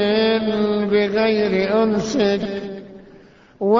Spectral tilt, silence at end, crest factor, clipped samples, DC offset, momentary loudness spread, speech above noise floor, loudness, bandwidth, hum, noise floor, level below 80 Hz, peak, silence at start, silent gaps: -5.5 dB/octave; 0 s; 14 dB; under 0.1%; under 0.1%; 10 LU; 29 dB; -19 LUFS; 7.6 kHz; none; -47 dBFS; -52 dBFS; -4 dBFS; 0 s; none